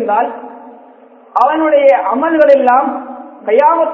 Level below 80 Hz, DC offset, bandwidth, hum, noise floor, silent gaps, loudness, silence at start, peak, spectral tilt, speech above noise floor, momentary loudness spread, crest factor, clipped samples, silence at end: -60 dBFS; under 0.1%; 5.6 kHz; none; -41 dBFS; none; -11 LUFS; 0 s; 0 dBFS; -6 dB/octave; 30 dB; 16 LU; 12 dB; 0.3%; 0 s